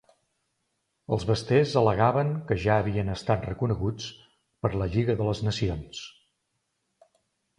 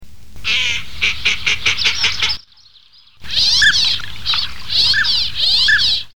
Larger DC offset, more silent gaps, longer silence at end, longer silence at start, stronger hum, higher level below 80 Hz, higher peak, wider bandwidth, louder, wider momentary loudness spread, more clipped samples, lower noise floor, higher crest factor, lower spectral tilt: second, under 0.1% vs 7%; neither; first, 1.5 s vs 0 s; first, 1.1 s vs 0 s; neither; second, -46 dBFS vs -40 dBFS; second, -6 dBFS vs -2 dBFS; second, 10.5 kHz vs 19.5 kHz; second, -26 LUFS vs -14 LUFS; first, 14 LU vs 8 LU; neither; first, -78 dBFS vs -48 dBFS; about the same, 20 dB vs 16 dB; first, -7 dB/octave vs 0.5 dB/octave